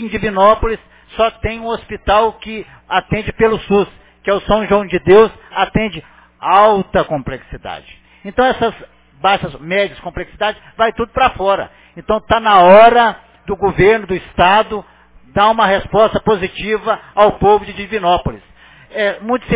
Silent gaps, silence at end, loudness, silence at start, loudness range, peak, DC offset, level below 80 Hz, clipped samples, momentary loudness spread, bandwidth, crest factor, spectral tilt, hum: none; 0 s; -14 LUFS; 0 s; 6 LU; 0 dBFS; under 0.1%; -36 dBFS; 0.2%; 17 LU; 4 kHz; 14 dB; -9 dB/octave; none